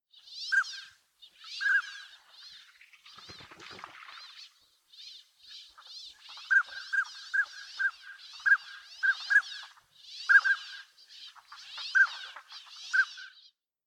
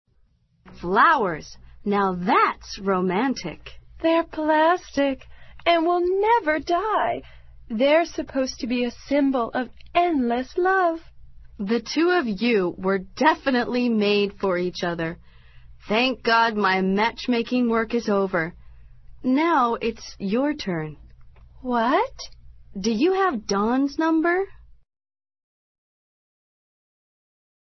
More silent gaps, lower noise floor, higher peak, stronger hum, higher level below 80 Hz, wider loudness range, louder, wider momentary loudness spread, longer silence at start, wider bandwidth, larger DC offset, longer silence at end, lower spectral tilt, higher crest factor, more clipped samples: neither; about the same, -63 dBFS vs -62 dBFS; second, -10 dBFS vs -4 dBFS; neither; second, -84 dBFS vs -50 dBFS; first, 20 LU vs 3 LU; second, -28 LUFS vs -22 LUFS; first, 24 LU vs 11 LU; second, 0.3 s vs 0.65 s; first, 11.5 kHz vs 6.2 kHz; neither; second, 0.6 s vs 3.15 s; second, 2 dB/octave vs -5.5 dB/octave; about the same, 22 dB vs 18 dB; neither